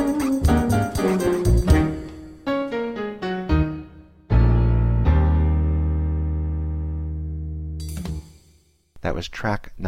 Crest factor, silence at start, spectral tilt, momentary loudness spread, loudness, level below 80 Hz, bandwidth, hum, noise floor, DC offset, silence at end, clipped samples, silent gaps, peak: 18 dB; 0 s; -7.5 dB/octave; 13 LU; -23 LUFS; -24 dBFS; 14.5 kHz; none; -58 dBFS; under 0.1%; 0 s; under 0.1%; none; -2 dBFS